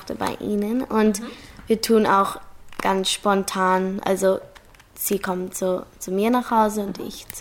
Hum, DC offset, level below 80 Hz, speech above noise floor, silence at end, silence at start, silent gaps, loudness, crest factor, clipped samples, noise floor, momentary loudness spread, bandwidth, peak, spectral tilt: none; under 0.1%; -52 dBFS; 26 dB; 0 s; 0 s; none; -22 LUFS; 16 dB; under 0.1%; -48 dBFS; 11 LU; 17 kHz; -6 dBFS; -4.5 dB/octave